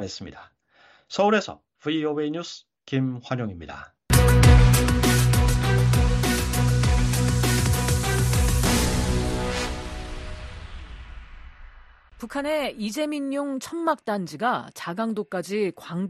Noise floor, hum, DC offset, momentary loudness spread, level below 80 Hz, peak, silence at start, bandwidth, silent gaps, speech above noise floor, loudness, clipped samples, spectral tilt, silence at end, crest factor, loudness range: -57 dBFS; none; under 0.1%; 18 LU; -28 dBFS; -4 dBFS; 0 s; 14.5 kHz; none; 30 dB; -23 LUFS; under 0.1%; -5 dB/octave; 0 s; 18 dB; 12 LU